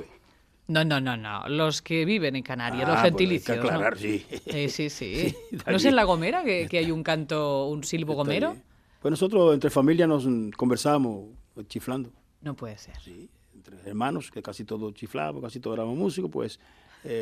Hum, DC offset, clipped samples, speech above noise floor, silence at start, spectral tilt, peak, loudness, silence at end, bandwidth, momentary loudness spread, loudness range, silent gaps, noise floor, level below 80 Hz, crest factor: none; under 0.1%; under 0.1%; 34 dB; 0 s; -5.5 dB/octave; -6 dBFS; -26 LUFS; 0 s; 15 kHz; 18 LU; 11 LU; none; -60 dBFS; -54 dBFS; 22 dB